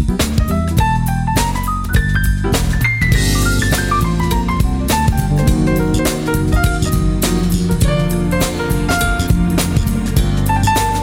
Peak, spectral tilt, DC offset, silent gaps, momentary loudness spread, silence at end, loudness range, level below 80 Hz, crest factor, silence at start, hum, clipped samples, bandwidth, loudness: -2 dBFS; -5.5 dB/octave; under 0.1%; none; 3 LU; 0 s; 1 LU; -20 dBFS; 12 dB; 0 s; none; under 0.1%; 16.5 kHz; -16 LUFS